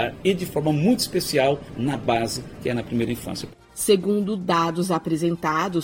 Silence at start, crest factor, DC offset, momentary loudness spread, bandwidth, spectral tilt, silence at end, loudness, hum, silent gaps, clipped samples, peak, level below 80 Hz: 0 s; 18 dB; under 0.1%; 8 LU; 17 kHz; -5 dB/octave; 0 s; -23 LUFS; none; none; under 0.1%; -6 dBFS; -50 dBFS